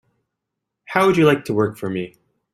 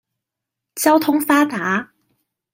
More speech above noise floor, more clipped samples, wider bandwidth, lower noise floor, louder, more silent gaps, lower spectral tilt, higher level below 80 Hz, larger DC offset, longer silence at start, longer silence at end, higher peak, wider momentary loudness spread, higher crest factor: second, 63 dB vs 67 dB; neither; about the same, 15.5 kHz vs 16.5 kHz; about the same, -81 dBFS vs -83 dBFS; about the same, -19 LUFS vs -17 LUFS; neither; first, -6.5 dB/octave vs -4 dB/octave; first, -58 dBFS vs -68 dBFS; neither; first, 0.9 s vs 0.75 s; second, 0.45 s vs 0.7 s; about the same, -2 dBFS vs -2 dBFS; first, 13 LU vs 8 LU; about the same, 18 dB vs 18 dB